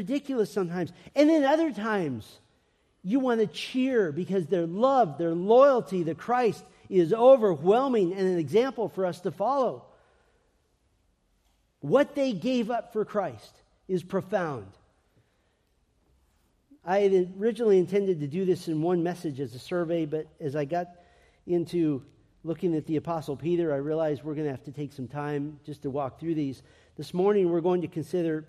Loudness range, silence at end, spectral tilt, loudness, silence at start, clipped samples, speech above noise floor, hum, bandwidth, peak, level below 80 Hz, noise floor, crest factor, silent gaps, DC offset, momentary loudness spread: 9 LU; 0.05 s; -7 dB/octave; -27 LUFS; 0 s; under 0.1%; 44 dB; none; 13.5 kHz; -8 dBFS; -68 dBFS; -70 dBFS; 20 dB; none; under 0.1%; 13 LU